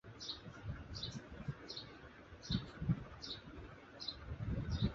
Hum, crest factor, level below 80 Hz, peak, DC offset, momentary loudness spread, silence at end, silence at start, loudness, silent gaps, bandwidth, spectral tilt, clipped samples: none; 20 dB; -52 dBFS; -24 dBFS; under 0.1%; 14 LU; 0 s; 0.05 s; -45 LUFS; none; 7.6 kHz; -5 dB/octave; under 0.1%